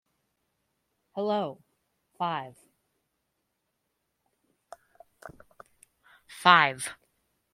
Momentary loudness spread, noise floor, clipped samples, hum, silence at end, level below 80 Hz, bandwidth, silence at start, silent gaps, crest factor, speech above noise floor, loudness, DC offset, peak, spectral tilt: 22 LU; -80 dBFS; under 0.1%; none; 0.6 s; -76 dBFS; 15.5 kHz; 1.15 s; none; 30 dB; 54 dB; -26 LUFS; under 0.1%; -2 dBFS; -3 dB/octave